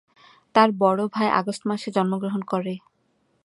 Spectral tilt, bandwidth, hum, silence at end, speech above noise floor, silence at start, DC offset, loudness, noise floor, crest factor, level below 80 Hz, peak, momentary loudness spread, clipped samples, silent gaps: -6 dB/octave; 11.5 kHz; none; 0.65 s; 45 dB; 0.55 s; under 0.1%; -23 LUFS; -68 dBFS; 22 dB; -72 dBFS; -2 dBFS; 9 LU; under 0.1%; none